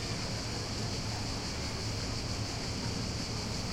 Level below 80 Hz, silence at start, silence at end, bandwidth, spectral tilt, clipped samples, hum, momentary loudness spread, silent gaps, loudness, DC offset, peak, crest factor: -46 dBFS; 0 s; 0 s; 16.5 kHz; -4 dB/octave; under 0.1%; none; 1 LU; none; -35 LUFS; under 0.1%; -22 dBFS; 14 dB